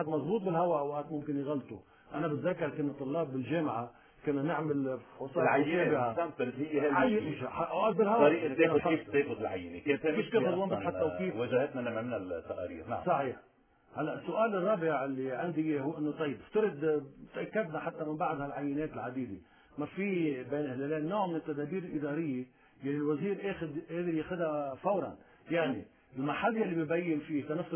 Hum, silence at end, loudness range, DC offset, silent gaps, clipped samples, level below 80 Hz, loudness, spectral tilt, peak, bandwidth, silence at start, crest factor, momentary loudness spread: none; 0 s; 6 LU; under 0.1%; none; under 0.1%; -66 dBFS; -33 LUFS; -5.5 dB/octave; -12 dBFS; 3.5 kHz; 0 s; 20 dB; 10 LU